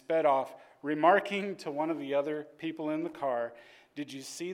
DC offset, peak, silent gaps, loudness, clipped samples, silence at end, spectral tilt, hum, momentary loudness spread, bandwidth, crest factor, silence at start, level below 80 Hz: under 0.1%; -10 dBFS; none; -31 LUFS; under 0.1%; 0 s; -5 dB/octave; none; 17 LU; 16 kHz; 20 dB; 0.1 s; -84 dBFS